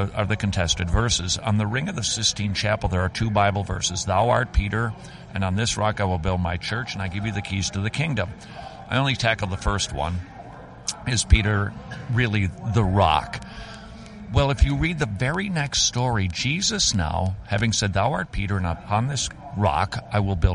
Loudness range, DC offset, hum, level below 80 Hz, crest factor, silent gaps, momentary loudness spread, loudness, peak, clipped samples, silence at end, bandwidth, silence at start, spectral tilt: 3 LU; under 0.1%; none; -32 dBFS; 22 dB; none; 11 LU; -23 LUFS; -2 dBFS; under 0.1%; 0 s; 11.5 kHz; 0 s; -4 dB/octave